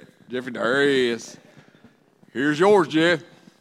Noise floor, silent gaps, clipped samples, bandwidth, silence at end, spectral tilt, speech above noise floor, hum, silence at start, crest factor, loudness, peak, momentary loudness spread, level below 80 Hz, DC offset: -55 dBFS; none; under 0.1%; 12.5 kHz; 0.35 s; -5 dB/octave; 34 dB; none; 0.3 s; 18 dB; -21 LUFS; -6 dBFS; 15 LU; -70 dBFS; under 0.1%